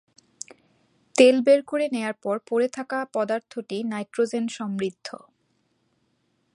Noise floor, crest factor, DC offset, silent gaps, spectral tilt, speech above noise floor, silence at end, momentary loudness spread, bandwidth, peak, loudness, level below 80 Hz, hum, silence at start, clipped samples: -70 dBFS; 24 dB; under 0.1%; none; -4.5 dB/octave; 47 dB; 1.45 s; 22 LU; 11.5 kHz; -2 dBFS; -24 LUFS; -78 dBFS; none; 1.15 s; under 0.1%